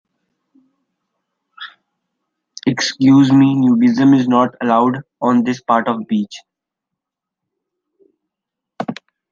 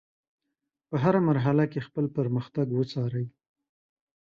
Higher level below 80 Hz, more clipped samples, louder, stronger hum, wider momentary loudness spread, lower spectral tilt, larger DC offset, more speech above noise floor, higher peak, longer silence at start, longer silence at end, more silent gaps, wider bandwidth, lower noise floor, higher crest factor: about the same, -62 dBFS vs -66 dBFS; neither; first, -14 LUFS vs -27 LUFS; neither; first, 23 LU vs 9 LU; second, -6 dB/octave vs -9.5 dB/octave; neither; first, 69 dB vs 58 dB; first, -2 dBFS vs -8 dBFS; first, 1.6 s vs 0.9 s; second, 0.4 s vs 1 s; neither; about the same, 7.4 kHz vs 7 kHz; about the same, -83 dBFS vs -84 dBFS; about the same, 16 dB vs 20 dB